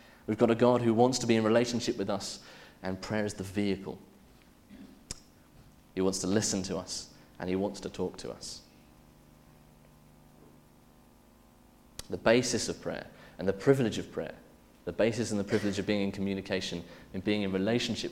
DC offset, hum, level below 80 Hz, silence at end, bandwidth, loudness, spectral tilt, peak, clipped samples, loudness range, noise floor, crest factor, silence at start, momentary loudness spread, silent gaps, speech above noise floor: under 0.1%; 50 Hz at -60 dBFS; -60 dBFS; 0 s; 16.5 kHz; -31 LUFS; -5 dB/octave; -8 dBFS; under 0.1%; 10 LU; -59 dBFS; 24 dB; 0.3 s; 19 LU; none; 29 dB